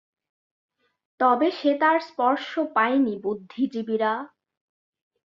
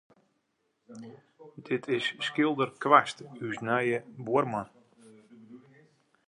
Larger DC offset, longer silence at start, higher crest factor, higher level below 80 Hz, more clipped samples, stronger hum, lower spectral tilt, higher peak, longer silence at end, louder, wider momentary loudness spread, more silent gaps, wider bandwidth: neither; first, 1.2 s vs 0.9 s; second, 20 dB vs 26 dB; about the same, -74 dBFS vs -76 dBFS; neither; neither; about the same, -6 dB/octave vs -5.5 dB/octave; about the same, -6 dBFS vs -4 dBFS; first, 1.05 s vs 0.7 s; first, -24 LUFS vs -28 LUFS; second, 9 LU vs 25 LU; neither; second, 7 kHz vs 11 kHz